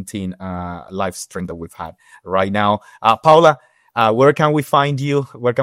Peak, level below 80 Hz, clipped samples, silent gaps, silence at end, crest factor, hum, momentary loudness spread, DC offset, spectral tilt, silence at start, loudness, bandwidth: 0 dBFS; -56 dBFS; under 0.1%; none; 0 s; 16 dB; none; 17 LU; under 0.1%; -6 dB/octave; 0 s; -16 LUFS; 16 kHz